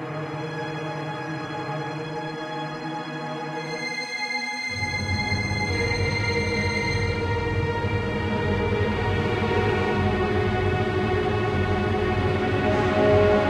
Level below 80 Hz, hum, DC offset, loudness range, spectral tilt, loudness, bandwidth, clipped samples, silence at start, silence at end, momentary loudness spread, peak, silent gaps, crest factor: -40 dBFS; none; under 0.1%; 7 LU; -6 dB/octave; -25 LUFS; 11 kHz; under 0.1%; 0 s; 0 s; 8 LU; -6 dBFS; none; 18 dB